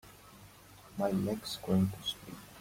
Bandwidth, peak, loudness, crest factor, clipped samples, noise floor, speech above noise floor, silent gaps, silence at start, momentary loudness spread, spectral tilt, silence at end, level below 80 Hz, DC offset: 16.5 kHz; -18 dBFS; -34 LUFS; 18 dB; under 0.1%; -56 dBFS; 23 dB; none; 0.05 s; 24 LU; -6 dB/octave; 0 s; -62 dBFS; under 0.1%